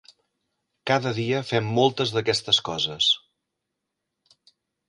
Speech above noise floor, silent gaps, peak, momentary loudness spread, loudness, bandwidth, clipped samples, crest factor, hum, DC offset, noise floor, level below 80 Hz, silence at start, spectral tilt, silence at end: 59 dB; none; -6 dBFS; 5 LU; -23 LUFS; 11.5 kHz; under 0.1%; 20 dB; none; under 0.1%; -82 dBFS; -64 dBFS; 0.85 s; -4 dB/octave; 1.7 s